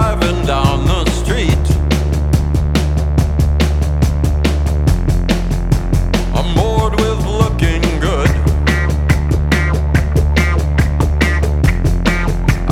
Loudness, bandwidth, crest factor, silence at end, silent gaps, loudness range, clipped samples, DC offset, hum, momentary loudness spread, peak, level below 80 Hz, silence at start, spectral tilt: -15 LUFS; 14.5 kHz; 12 dB; 0 s; none; 1 LU; under 0.1%; under 0.1%; none; 2 LU; 0 dBFS; -16 dBFS; 0 s; -6 dB/octave